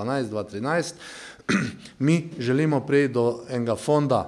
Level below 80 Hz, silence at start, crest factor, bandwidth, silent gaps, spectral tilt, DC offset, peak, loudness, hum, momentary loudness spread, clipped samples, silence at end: -62 dBFS; 0 s; 16 dB; 12 kHz; none; -6.5 dB/octave; under 0.1%; -8 dBFS; -24 LUFS; none; 12 LU; under 0.1%; 0 s